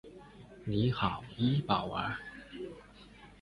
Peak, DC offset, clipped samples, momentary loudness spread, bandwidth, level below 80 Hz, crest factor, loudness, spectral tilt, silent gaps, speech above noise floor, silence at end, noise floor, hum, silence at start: -14 dBFS; under 0.1%; under 0.1%; 23 LU; 11 kHz; -56 dBFS; 22 dB; -34 LUFS; -8 dB/octave; none; 23 dB; 0.05 s; -55 dBFS; none; 0.05 s